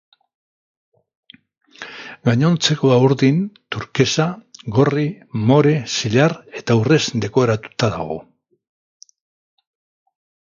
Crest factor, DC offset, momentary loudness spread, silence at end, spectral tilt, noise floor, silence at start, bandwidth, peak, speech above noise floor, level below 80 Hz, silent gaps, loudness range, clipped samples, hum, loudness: 18 dB; under 0.1%; 14 LU; 2.2 s; -5.5 dB/octave; -36 dBFS; 1.8 s; 7.6 kHz; 0 dBFS; 19 dB; -54 dBFS; none; 4 LU; under 0.1%; none; -18 LUFS